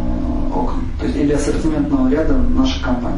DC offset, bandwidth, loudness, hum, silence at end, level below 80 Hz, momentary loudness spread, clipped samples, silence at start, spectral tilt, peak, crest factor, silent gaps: under 0.1%; 11 kHz; -18 LUFS; none; 0 s; -22 dBFS; 6 LU; under 0.1%; 0 s; -6.5 dB/octave; -4 dBFS; 12 dB; none